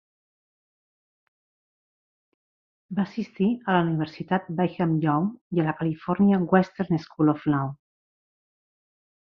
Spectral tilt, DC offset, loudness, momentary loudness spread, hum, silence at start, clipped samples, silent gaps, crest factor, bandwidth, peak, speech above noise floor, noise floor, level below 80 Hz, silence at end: -9.5 dB/octave; under 0.1%; -25 LUFS; 8 LU; none; 2.9 s; under 0.1%; 5.41-5.51 s; 22 dB; 6.2 kHz; -4 dBFS; over 66 dB; under -90 dBFS; -64 dBFS; 1.45 s